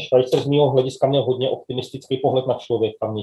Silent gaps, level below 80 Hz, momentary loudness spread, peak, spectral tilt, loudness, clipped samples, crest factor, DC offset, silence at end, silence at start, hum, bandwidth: none; -62 dBFS; 10 LU; -4 dBFS; -7 dB/octave; -20 LUFS; under 0.1%; 16 dB; under 0.1%; 0 s; 0 s; none; 12 kHz